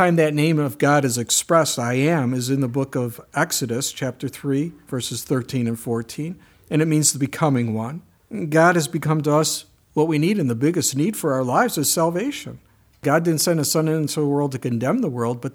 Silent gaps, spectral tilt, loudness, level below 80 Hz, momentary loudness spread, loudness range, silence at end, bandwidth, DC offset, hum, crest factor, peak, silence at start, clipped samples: none; -4.5 dB/octave; -21 LUFS; -62 dBFS; 10 LU; 4 LU; 0.05 s; 20 kHz; under 0.1%; none; 18 dB; -2 dBFS; 0 s; under 0.1%